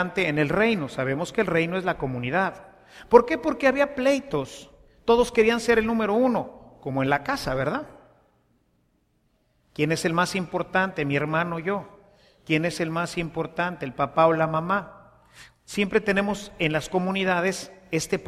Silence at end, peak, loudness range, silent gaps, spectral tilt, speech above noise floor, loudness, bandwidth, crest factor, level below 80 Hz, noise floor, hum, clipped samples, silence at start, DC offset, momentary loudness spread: 0 s; -2 dBFS; 6 LU; none; -5.5 dB/octave; 44 dB; -24 LUFS; 14.5 kHz; 24 dB; -52 dBFS; -68 dBFS; none; under 0.1%; 0 s; under 0.1%; 10 LU